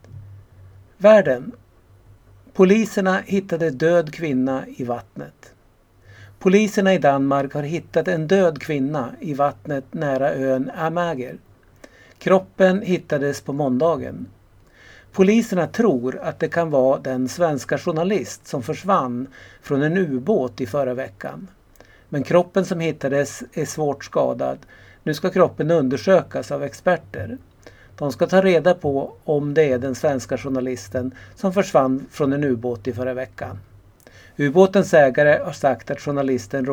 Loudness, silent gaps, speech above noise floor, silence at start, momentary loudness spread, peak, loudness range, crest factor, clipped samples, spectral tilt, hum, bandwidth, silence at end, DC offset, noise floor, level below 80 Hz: -20 LUFS; none; 35 dB; 0.15 s; 13 LU; 0 dBFS; 4 LU; 20 dB; under 0.1%; -6.5 dB/octave; none; 18 kHz; 0 s; under 0.1%; -55 dBFS; -56 dBFS